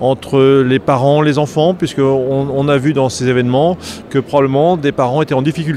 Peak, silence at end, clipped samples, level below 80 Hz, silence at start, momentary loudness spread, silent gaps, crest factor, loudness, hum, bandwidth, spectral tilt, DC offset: 0 dBFS; 0 s; under 0.1%; -46 dBFS; 0 s; 4 LU; none; 12 dB; -13 LUFS; none; 13 kHz; -6.5 dB/octave; under 0.1%